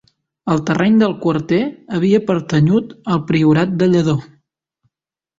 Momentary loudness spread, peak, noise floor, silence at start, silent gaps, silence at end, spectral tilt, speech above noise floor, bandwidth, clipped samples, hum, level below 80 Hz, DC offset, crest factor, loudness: 7 LU; -2 dBFS; -80 dBFS; 0.45 s; none; 1.15 s; -7.5 dB/octave; 65 dB; 7.8 kHz; under 0.1%; none; -50 dBFS; under 0.1%; 14 dB; -16 LUFS